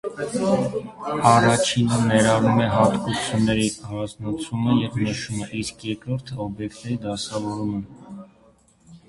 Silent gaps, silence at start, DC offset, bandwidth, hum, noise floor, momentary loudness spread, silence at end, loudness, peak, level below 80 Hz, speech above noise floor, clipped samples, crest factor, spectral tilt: none; 0.05 s; under 0.1%; 11.5 kHz; none; -56 dBFS; 13 LU; 0.1 s; -22 LUFS; -2 dBFS; -50 dBFS; 34 dB; under 0.1%; 22 dB; -5.5 dB/octave